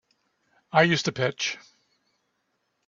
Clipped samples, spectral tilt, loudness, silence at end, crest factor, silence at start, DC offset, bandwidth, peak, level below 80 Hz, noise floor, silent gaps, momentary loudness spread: under 0.1%; -4 dB/octave; -24 LUFS; 1.3 s; 24 dB; 0.75 s; under 0.1%; 7.6 kHz; -4 dBFS; -66 dBFS; -75 dBFS; none; 9 LU